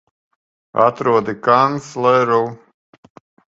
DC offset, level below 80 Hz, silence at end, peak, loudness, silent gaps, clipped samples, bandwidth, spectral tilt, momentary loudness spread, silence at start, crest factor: under 0.1%; -62 dBFS; 0.95 s; 0 dBFS; -16 LUFS; none; under 0.1%; 8 kHz; -6 dB/octave; 5 LU; 0.75 s; 18 dB